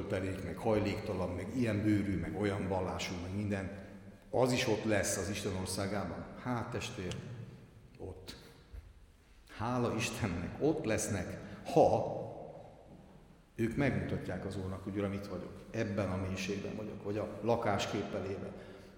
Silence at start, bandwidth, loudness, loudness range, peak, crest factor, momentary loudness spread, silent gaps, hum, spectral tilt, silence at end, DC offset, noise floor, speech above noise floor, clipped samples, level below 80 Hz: 0 s; 18 kHz; -36 LUFS; 7 LU; -14 dBFS; 22 dB; 18 LU; none; none; -5.5 dB/octave; 0 s; under 0.1%; -60 dBFS; 25 dB; under 0.1%; -60 dBFS